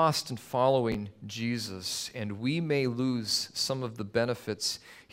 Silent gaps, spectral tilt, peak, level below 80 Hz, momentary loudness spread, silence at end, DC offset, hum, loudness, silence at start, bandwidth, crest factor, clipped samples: none; -4.5 dB/octave; -12 dBFS; -62 dBFS; 8 LU; 0.1 s; under 0.1%; none; -31 LUFS; 0 s; 16 kHz; 20 dB; under 0.1%